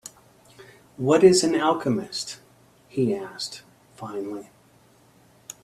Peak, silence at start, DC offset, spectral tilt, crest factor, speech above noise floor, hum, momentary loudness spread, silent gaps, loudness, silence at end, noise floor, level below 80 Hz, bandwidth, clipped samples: -4 dBFS; 0.05 s; under 0.1%; -4.5 dB/octave; 22 dB; 35 dB; none; 25 LU; none; -23 LUFS; 1.2 s; -57 dBFS; -64 dBFS; 13.5 kHz; under 0.1%